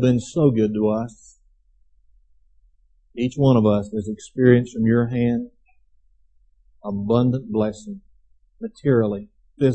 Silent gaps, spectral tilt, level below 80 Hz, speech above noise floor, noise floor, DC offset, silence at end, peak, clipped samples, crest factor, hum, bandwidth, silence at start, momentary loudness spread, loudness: none; -8 dB/octave; -52 dBFS; 38 dB; -58 dBFS; under 0.1%; 0 s; -2 dBFS; under 0.1%; 20 dB; none; 8.6 kHz; 0 s; 19 LU; -21 LUFS